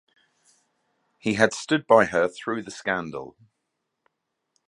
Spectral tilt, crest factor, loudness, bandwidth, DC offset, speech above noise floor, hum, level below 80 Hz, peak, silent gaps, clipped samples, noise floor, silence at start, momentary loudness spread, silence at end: -4.5 dB/octave; 26 dB; -23 LUFS; 11 kHz; under 0.1%; 56 dB; none; -62 dBFS; 0 dBFS; none; under 0.1%; -79 dBFS; 1.25 s; 16 LU; 1.4 s